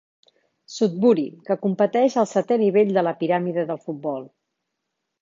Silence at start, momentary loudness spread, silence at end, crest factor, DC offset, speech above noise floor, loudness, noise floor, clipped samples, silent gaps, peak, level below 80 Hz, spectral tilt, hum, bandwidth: 0.7 s; 11 LU; 0.95 s; 16 dB; under 0.1%; 59 dB; -21 LUFS; -80 dBFS; under 0.1%; none; -6 dBFS; -74 dBFS; -6.5 dB/octave; none; 7.6 kHz